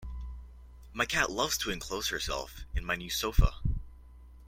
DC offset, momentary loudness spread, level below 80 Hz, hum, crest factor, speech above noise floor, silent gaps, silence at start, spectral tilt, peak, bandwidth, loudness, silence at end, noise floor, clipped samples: under 0.1%; 15 LU; -36 dBFS; none; 22 dB; 21 dB; none; 0 s; -3 dB/octave; -10 dBFS; 16.5 kHz; -32 LUFS; 0 s; -52 dBFS; under 0.1%